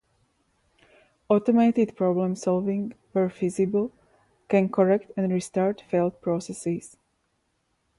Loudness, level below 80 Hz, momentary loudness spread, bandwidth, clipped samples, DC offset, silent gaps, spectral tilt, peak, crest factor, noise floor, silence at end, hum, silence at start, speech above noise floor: -25 LUFS; -66 dBFS; 9 LU; 11.5 kHz; under 0.1%; under 0.1%; none; -7.5 dB/octave; -8 dBFS; 18 dB; -73 dBFS; 1.1 s; none; 1.3 s; 49 dB